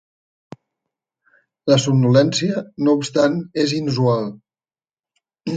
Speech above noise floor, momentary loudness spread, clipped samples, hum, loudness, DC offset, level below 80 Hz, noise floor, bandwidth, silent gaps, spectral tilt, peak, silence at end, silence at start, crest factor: over 73 dB; 9 LU; under 0.1%; none; -18 LUFS; under 0.1%; -62 dBFS; under -90 dBFS; 9.2 kHz; none; -6 dB/octave; -2 dBFS; 0 s; 1.65 s; 18 dB